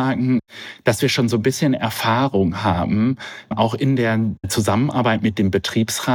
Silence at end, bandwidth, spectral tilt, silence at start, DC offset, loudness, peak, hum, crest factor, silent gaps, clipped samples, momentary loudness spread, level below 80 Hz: 0 s; 19 kHz; -5.5 dB/octave; 0 s; under 0.1%; -19 LUFS; -4 dBFS; none; 14 dB; none; under 0.1%; 4 LU; -52 dBFS